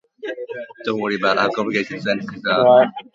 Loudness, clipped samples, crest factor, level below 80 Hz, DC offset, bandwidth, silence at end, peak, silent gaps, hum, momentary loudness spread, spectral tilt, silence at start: -18 LUFS; under 0.1%; 18 dB; -64 dBFS; under 0.1%; 7.6 kHz; 0.15 s; -2 dBFS; none; none; 17 LU; -5.5 dB/octave; 0.2 s